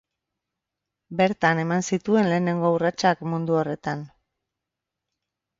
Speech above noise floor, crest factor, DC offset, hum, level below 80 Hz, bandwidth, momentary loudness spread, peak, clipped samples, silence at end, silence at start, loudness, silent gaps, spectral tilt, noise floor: 63 dB; 20 dB; under 0.1%; none; -64 dBFS; 7.8 kHz; 9 LU; -6 dBFS; under 0.1%; 1.55 s; 1.1 s; -23 LUFS; none; -6 dB/octave; -85 dBFS